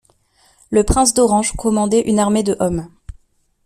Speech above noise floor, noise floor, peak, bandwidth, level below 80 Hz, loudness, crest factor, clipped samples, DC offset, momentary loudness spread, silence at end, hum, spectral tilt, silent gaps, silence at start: 41 dB; -56 dBFS; 0 dBFS; 14.5 kHz; -32 dBFS; -16 LUFS; 16 dB; under 0.1%; under 0.1%; 7 LU; 0.8 s; none; -4.5 dB/octave; none; 0.7 s